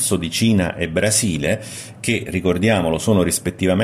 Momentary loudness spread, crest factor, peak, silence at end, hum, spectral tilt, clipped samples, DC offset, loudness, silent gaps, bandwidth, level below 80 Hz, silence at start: 5 LU; 16 dB; -2 dBFS; 0 s; none; -4.5 dB/octave; under 0.1%; under 0.1%; -19 LUFS; none; 14.5 kHz; -42 dBFS; 0 s